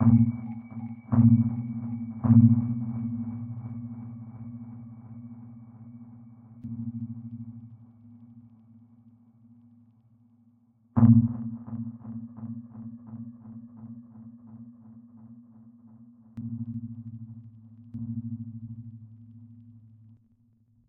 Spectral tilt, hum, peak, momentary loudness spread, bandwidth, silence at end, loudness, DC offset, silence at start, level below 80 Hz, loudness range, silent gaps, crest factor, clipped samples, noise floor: -14.5 dB/octave; none; -6 dBFS; 28 LU; 2.4 kHz; 1.15 s; -27 LUFS; under 0.1%; 0 s; -58 dBFS; 20 LU; none; 22 dB; under 0.1%; -64 dBFS